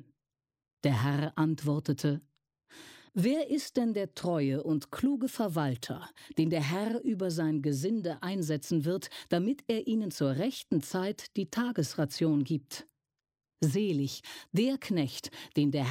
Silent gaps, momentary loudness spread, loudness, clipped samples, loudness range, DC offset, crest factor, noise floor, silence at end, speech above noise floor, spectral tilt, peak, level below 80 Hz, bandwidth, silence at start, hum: none; 7 LU; -32 LUFS; under 0.1%; 1 LU; under 0.1%; 16 dB; under -90 dBFS; 0 s; over 59 dB; -6.5 dB/octave; -16 dBFS; -72 dBFS; 16.5 kHz; 0.85 s; none